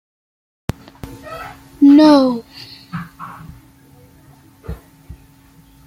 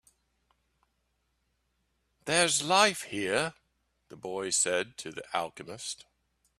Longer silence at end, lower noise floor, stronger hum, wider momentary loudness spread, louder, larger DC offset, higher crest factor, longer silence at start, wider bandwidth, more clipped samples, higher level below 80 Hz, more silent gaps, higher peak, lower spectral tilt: about the same, 0.75 s vs 0.65 s; second, -47 dBFS vs -77 dBFS; neither; first, 27 LU vs 16 LU; first, -11 LUFS vs -28 LUFS; neither; second, 18 dB vs 26 dB; second, 1.05 s vs 2.25 s; second, 13.5 kHz vs 15 kHz; neither; first, -44 dBFS vs -70 dBFS; neither; first, -2 dBFS vs -6 dBFS; first, -6.5 dB/octave vs -1.5 dB/octave